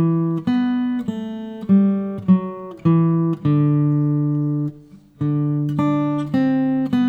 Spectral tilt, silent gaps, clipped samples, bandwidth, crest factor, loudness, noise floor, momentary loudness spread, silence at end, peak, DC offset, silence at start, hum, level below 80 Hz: -10 dB/octave; none; under 0.1%; 5.2 kHz; 14 dB; -20 LUFS; -44 dBFS; 9 LU; 0 s; -4 dBFS; under 0.1%; 0 s; none; -58 dBFS